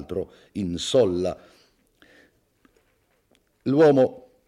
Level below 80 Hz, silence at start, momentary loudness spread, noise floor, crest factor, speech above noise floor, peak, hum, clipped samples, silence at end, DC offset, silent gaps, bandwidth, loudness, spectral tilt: -60 dBFS; 0 s; 16 LU; -67 dBFS; 18 dB; 45 dB; -6 dBFS; none; under 0.1%; 0.3 s; under 0.1%; none; 11.5 kHz; -22 LUFS; -6 dB/octave